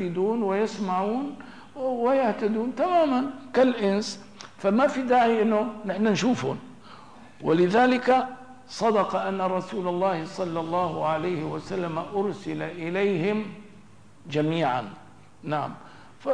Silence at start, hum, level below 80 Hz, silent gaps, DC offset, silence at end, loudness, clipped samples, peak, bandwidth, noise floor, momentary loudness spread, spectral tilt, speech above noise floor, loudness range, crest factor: 0 s; none; -66 dBFS; none; 0.3%; 0 s; -25 LUFS; under 0.1%; -12 dBFS; 10.5 kHz; -52 dBFS; 14 LU; -6 dB/octave; 27 dB; 5 LU; 14 dB